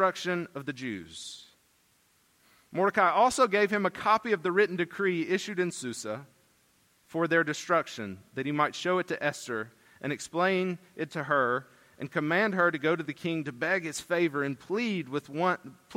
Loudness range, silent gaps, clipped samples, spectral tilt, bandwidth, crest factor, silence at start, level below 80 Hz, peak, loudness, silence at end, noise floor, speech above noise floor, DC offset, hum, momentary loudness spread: 5 LU; none; under 0.1%; -4.5 dB/octave; 16 kHz; 20 dB; 0 s; -72 dBFS; -10 dBFS; -29 LUFS; 0 s; -67 dBFS; 38 dB; under 0.1%; none; 13 LU